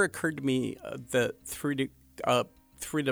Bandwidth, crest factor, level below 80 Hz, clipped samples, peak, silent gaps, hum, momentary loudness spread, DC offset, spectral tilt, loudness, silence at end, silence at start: over 20 kHz; 18 dB; -62 dBFS; under 0.1%; -12 dBFS; none; none; 9 LU; under 0.1%; -4.5 dB/octave; -31 LUFS; 0 s; 0 s